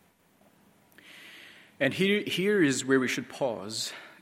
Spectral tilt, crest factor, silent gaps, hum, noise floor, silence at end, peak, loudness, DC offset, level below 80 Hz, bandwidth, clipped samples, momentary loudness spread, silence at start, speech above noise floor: -4 dB/octave; 20 dB; none; none; -63 dBFS; 0.1 s; -10 dBFS; -28 LUFS; under 0.1%; -76 dBFS; 16 kHz; under 0.1%; 23 LU; 1.05 s; 36 dB